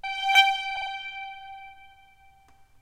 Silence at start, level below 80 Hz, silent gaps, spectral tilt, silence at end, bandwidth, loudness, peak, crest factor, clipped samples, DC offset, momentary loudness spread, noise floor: 0.05 s; -62 dBFS; none; 2.5 dB/octave; 0.95 s; 16 kHz; -23 LUFS; -6 dBFS; 22 dB; under 0.1%; under 0.1%; 24 LU; -56 dBFS